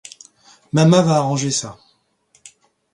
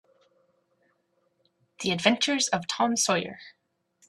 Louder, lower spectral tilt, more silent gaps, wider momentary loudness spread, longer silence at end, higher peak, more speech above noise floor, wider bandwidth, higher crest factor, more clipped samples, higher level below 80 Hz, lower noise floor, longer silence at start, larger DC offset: first, -16 LUFS vs -25 LUFS; first, -5.5 dB/octave vs -2.5 dB/octave; neither; first, 18 LU vs 11 LU; first, 1.2 s vs 0.6 s; first, 0 dBFS vs -4 dBFS; about the same, 44 dB vs 46 dB; second, 11.5 kHz vs 13.5 kHz; second, 20 dB vs 26 dB; neither; first, -58 dBFS vs -70 dBFS; second, -60 dBFS vs -72 dBFS; second, 0.75 s vs 1.8 s; neither